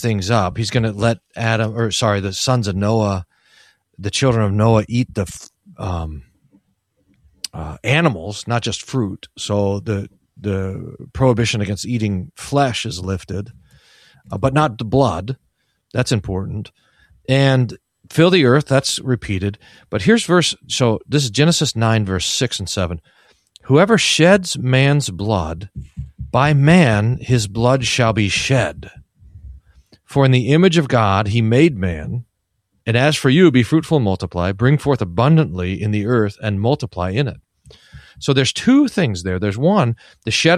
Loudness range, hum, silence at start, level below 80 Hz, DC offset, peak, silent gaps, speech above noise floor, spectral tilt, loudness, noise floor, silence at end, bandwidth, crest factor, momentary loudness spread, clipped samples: 6 LU; none; 0 s; -42 dBFS; under 0.1%; 0 dBFS; none; 52 dB; -5.5 dB/octave; -17 LUFS; -68 dBFS; 0 s; 13.5 kHz; 16 dB; 14 LU; under 0.1%